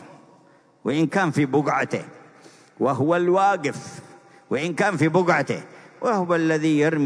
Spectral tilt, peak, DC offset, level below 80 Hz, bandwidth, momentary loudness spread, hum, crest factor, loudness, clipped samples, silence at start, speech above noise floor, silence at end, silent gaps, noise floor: -6.5 dB/octave; -6 dBFS; under 0.1%; -74 dBFS; 11 kHz; 12 LU; none; 16 dB; -22 LUFS; under 0.1%; 0 s; 34 dB; 0 s; none; -55 dBFS